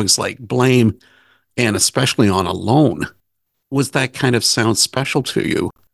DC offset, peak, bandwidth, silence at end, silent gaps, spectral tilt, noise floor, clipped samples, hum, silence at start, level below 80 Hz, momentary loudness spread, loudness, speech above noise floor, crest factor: under 0.1%; 0 dBFS; 13 kHz; 0.25 s; none; -4 dB/octave; -73 dBFS; under 0.1%; none; 0 s; -44 dBFS; 8 LU; -16 LUFS; 56 dB; 16 dB